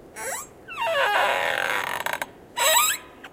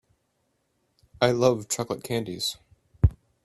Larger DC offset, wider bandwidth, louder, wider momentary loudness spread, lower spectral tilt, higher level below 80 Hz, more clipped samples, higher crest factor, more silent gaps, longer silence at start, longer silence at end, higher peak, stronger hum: neither; first, 17 kHz vs 15 kHz; first, -23 LUFS vs -26 LUFS; first, 13 LU vs 9 LU; second, 0.5 dB/octave vs -5 dB/octave; second, -62 dBFS vs -40 dBFS; neither; about the same, 20 dB vs 22 dB; neither; second, 0 s vs 1.2 s; second, 0.05 s vs 0.3 s; about the same, -6 dBFS vs -6 dBFS; neither